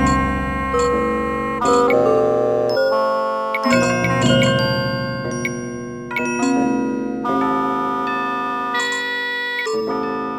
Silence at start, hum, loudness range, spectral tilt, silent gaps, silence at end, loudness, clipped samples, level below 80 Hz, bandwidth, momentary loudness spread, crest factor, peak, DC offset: 0 s; none; 4 LU; -5 dB/octave; none; 0 s; -19 LUFS; under 0.1%; -38 dBFS; 17 kHz; 8 LU; 16 dB; -4 dBFS; under 0.1%